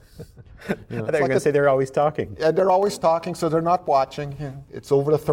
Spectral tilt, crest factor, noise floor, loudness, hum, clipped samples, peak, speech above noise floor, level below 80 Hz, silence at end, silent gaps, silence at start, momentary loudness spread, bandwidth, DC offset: -6.5 dB/octave; 14 dB; -43 dBFS; -21 LUFS; none; under 0.1%; -8 dBFS; 22 dB; -52 dBFS; 0 s; none; 0.15 s; 13 LU; 16.5 kHz; under 0.1%